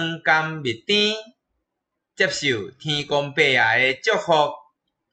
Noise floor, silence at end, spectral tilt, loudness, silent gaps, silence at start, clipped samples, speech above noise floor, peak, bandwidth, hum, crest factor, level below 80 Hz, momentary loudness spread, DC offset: -81 dBFS; 0.55 s; -3.5 dB/octave; -20 LUFS; none; 0 s; under 0.1%; 60 dB; -6 dBFS; 9 kHz; none; 18 dB; -62 dBFS; 9 LU; under 0.1%